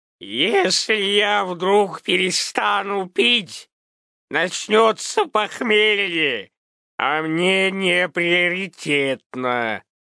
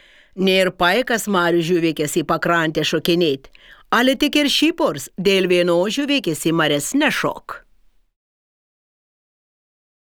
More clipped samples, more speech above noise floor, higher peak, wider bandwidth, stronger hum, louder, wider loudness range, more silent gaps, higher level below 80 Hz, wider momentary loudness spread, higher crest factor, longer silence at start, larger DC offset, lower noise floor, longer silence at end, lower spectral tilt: neither; first, over 70 dB vs 36 dB; about the same, -2 dBFS vs -2 dBFS; second, 11 kHz vs over 20 kHz; neither; about the same, -19 LUFS vs -18 LUFS; second, 2 LU vs 5 LU; first, 3.72-4.28 s, 6.57-6.98 s, 9.26-9.30 s vs none; second, -78 dBFS vs -52 dBFS; first, 9 LU vs 6 LU; about the same, 18 dB vs 18 dB; second, 0.2 s vs 0.35 s; neither; first, under -90 dBFS vs -54 dBFS; second, 0.35 s vs 2.5 s; about the same, -3 dB/octave vs -4 dB/octave